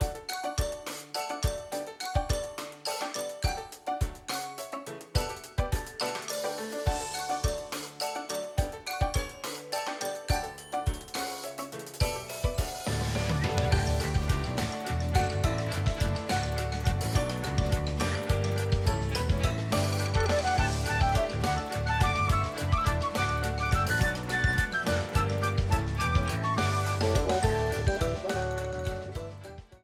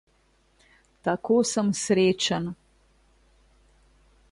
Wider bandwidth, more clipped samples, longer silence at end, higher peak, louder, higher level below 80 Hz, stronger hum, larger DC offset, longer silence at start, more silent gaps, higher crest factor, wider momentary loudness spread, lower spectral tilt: first, 16.5 kHz vs 11.5 kHz; neither; second, 0.05 s vs 1.8 s; about the same, -10 dBFS vs -10 dBFS; second, -30 LUFS vs -25 LUFS; first, -36 dBFS vs -60 dBFS; neither; neither; second, 0 s vs 1.05 s; neither; about the same, 18 dB vs 18 dB; second, 8 LU vs 11 LU; about the same, -5 dB/octave vs -4.5 dB/octave